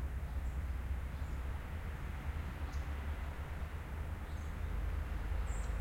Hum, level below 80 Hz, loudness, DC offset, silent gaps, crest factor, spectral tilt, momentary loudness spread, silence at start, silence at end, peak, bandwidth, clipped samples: none; -42 dBFS; -43 LUFS; under 0.1%; none; 12 dB; -6.5 dB/octave; 3 LU; 0 s; 0 s; -26 dBFS; 16.5 kHz; under 0.1%